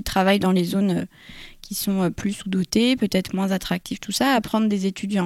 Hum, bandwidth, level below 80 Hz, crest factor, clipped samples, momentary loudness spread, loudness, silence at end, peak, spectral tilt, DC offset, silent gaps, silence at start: none; 16 kHz; -46 dBFS; 16 dB; under 0.1%; 9 LU; -22 LUFS; 0 s; -6 dBFS; -5 dB/octave; under 0.1%; none; 0 s